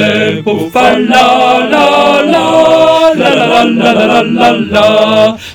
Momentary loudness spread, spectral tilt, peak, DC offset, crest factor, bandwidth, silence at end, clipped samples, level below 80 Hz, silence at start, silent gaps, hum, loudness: 3 LU; -4.5 dB/octave; 0 dBFS; under 0.1%; 8 dB; 19 kHz; 0 s; 4%; -42 dBFS; 0 s; none; none; -7 LUFS